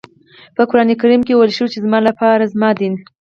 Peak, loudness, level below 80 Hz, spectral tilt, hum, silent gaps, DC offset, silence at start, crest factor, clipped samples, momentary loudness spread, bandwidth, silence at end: 0 dBFS; -14 LUFS; -58 dBFS; -7 dB/octave; none; none; under 0.1%; 0.6 s; 14 dB; under 0.1%; 7 LU; 6.8 kHz; 0.25 s